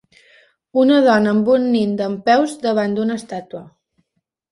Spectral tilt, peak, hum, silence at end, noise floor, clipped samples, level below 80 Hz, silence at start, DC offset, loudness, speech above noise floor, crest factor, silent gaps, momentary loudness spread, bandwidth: -6 dB/octave; -2 dBFS; none; 0.9 s; -73 dBFS; under 0.1%; -62 dBFS; 0.75 s; under 0.1%; -16 LUFS; 57 dB; 16 dB; none; 16 LU; 11.5 kHz